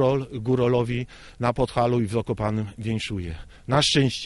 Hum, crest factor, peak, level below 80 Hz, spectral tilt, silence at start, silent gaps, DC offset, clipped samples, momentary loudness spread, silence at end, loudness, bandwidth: none; 18 dB; -6 dBFS; -46 dBFS; -5.5 dB/octave; 0 s; none; under 0.1%; under 0.1%; 11 LU; 0 s; -24 LUFS; 11.5 kHz